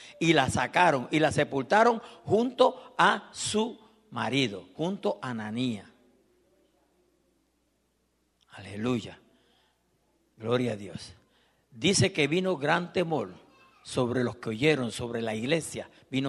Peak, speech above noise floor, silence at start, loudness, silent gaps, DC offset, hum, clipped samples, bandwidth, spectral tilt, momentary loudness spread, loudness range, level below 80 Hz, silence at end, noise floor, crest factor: -6 dBFS; 45 dB; 0 s; -27 LUFS; none; under 0.1%; none; under 0.1%; 12.5 kHz; -4.5 dB/octave; 15 LU; 15 LU; -62 dBFS; 0 s; -73 dBFS; 24 dB